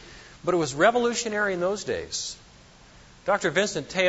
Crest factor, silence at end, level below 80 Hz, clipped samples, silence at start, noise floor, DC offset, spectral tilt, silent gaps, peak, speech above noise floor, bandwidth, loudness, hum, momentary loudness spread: 20 dB; 0 s; -56 dBFS; under 0.1%; 0 s; -52 dBFS; under 0.1%; -3.5 dB/octave; none; -6 dBFS; 27 dB; 8 kHz; -25 LUFS; none; 13 LU